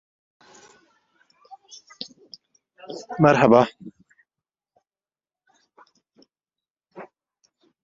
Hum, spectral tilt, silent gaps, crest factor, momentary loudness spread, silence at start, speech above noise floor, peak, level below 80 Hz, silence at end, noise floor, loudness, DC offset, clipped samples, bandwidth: none; -7 dB/octave; 6.70-6.75 s; 26 dB; 30 LU; 2.9 s; over 72 dB; -2 dBFS; -64 dBFS; 0.8 s; under -90 dBFS; -18 LUFS; under 0.1%; under 0.1%; 7.6 kHz